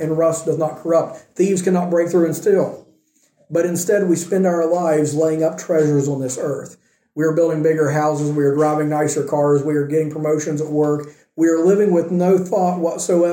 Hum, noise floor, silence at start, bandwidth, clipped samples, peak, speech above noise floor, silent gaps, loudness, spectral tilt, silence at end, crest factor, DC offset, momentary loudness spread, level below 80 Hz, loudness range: none; -59 dBFS; 0 s; 17 kHz; under 0.1%; -4 dBFS; 42 dB; none; -18 LUFS; -6.5 dB/octave; 0 s; 14 dB; under 0.1%; 5 LU; -64 dBFS; 1 LU